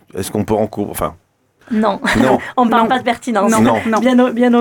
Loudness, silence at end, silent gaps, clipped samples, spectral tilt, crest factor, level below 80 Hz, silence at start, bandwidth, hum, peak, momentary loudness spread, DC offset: -15 LUFS; 0 s; none; under 0.1%; -5 dB/octave; 14 dB; -42 dBFS; 0.15 s; 19 kHz; none; -2 dBFS; 9 LU; under 0.1%